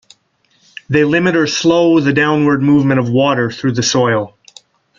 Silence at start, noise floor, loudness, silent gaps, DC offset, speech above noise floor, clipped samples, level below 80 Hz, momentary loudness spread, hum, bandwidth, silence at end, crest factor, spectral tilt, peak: 0.9 s; -58 dBFS; -13 LUFS; none; under 0.1%; 46 dB; under 0.1%; -52 dBFS; 5 LU; none; 7.6 kHz; 0.7 s; 14 dB; -5.5 dB/octave; 0 dBFS